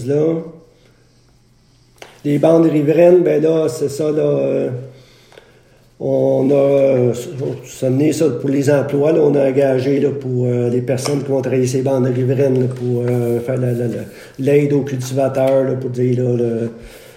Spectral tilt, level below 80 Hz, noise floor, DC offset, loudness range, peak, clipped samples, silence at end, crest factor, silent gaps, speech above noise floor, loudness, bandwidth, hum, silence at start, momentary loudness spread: -7.5 dB/octave; -56 dBFS; -52 dBFS; under 0.1%; 3 LU; 0 dBFS; under 0.1%; 0.2 s; 16 dB; none; 36 dB; -16 LUFS; 16 kHz; none; 0 s; 11 LU